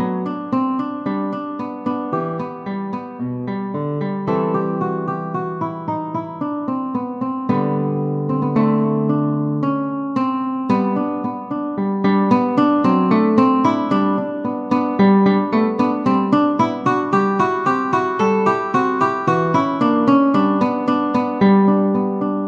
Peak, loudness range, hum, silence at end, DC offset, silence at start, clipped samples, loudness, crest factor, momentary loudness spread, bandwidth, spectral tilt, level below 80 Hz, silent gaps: -2 dBFS; 7 LU; none; 0 s; under 0.1%; 0 s; under 0.1%; -18 LUFS; 16 dB; 10 LU; 7.2 kHz; -8.5 dB/octave; -62 dBFS; none